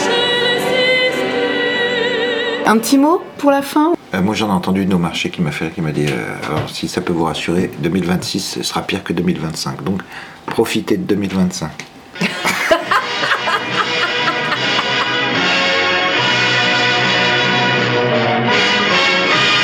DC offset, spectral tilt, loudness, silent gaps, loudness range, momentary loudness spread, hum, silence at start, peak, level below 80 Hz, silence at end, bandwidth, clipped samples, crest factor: under 0.1%; -4 dB/octave; -15 LUFS; none; 6 LU; 8 LU; none; 0 s; 0 dBFS; -50 dBFS; 0 s; 19.5 kHz; under 0.1%; 16 dB